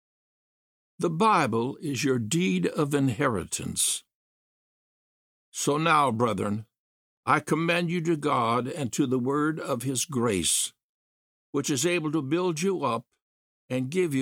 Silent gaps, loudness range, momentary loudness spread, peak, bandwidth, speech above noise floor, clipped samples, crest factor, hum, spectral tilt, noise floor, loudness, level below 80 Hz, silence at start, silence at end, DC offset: 4.14-5.52 s, 6.78-7.23 s, 10.83-11.53 s, 13.22-13.68 s; 3 LU; 9 LU; -8 dBFS; 17 kHz; over 64 dB; under 0.1%; 20 dB; none; -4.5 dB/octave; under -90 dBFS; -26 LUFS; -62 dBFS; 1 s; 0 s; under 0.1%